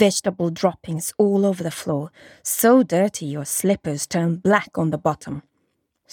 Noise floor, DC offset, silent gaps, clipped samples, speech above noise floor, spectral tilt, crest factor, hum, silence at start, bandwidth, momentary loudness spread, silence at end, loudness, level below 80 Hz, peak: -71 dBFS; under 0.1%; none; under 0.1%; 50 dB; -5 dB/octave; 18 dB; none; 0 s; 18 kHz; 12 LU; 0.7 s; -21 LUFS; -60 dBFS; -2 dBFS